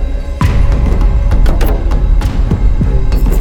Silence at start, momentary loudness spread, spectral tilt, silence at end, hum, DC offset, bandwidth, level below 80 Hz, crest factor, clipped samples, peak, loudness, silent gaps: 0 s; 2 LU; -7.5 dB/octave; 0 s; none; under 0.1%; 17 kHz; -10 dBFS; 8 dB; under 0.1%; 0 dBFS; -14 LUFS; none